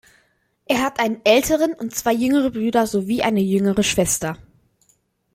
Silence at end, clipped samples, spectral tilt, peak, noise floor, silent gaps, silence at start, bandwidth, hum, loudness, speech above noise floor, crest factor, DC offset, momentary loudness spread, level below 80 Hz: 1 s; under 0.1%; -4 dB/octave; -4 dBFS; -63 dBFS; none; 0.7 s; 16.5 kHz; none; -19 LUFS; 44 dB; 18 dB; under 0.1%; 7 LU; -48 dBFS